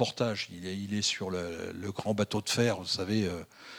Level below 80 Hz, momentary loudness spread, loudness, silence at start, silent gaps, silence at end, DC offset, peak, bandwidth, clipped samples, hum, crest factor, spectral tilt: -64 dBFS; 9 LU; -32 LUFS; 0 s; none; 0 s; under 0.1%; -12 dBFS; 17.5 kHz; under 0.1%; none; 20 dB; -4 dB/octave